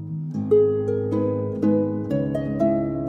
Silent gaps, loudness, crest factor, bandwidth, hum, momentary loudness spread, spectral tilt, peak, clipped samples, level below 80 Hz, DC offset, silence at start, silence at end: none; -22 LUFS; 14 dB; 6.4 kHz; none; 6 LU; -10.5 dB/octave; -8 dBFS; under 0.1%; -50 dBFS; under 0.1%; 0 s; 0 s